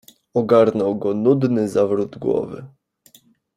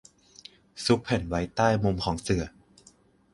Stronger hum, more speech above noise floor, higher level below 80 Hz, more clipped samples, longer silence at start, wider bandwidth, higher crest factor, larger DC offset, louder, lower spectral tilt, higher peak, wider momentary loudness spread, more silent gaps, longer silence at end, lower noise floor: neither; about the same, 36 dB vs 33 dB; second, -60 dBFS vs -46 dBFS; neither; second, 0.35 s vs 0.75 s; first, 15.5 kHz vs 11.5 kHz; about the same, 18 dB vs 22 dB; neither; first, -19 LUFS vs -27 LUFS; first, -8 dB/octave vs -5.5 dB/octave; first, -2 dBFS vs -8 dBFS; second, 10 LU vs 23 LU; neither; about the same, 0.9 s vs 0.85 s; second, -54 dBFS vs -59 dBFS